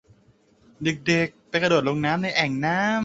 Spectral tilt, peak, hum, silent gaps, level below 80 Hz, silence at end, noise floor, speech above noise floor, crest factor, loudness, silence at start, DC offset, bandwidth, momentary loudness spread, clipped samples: -5 dB/octave; -4 dBFS; none; none; -60 dBFS; 0 s; -59 dBFS; 36 dB; 20 dB; -23 LUFS; 0.8 s; under 0.1%; 8 kHz; 5 LU; under 0.1%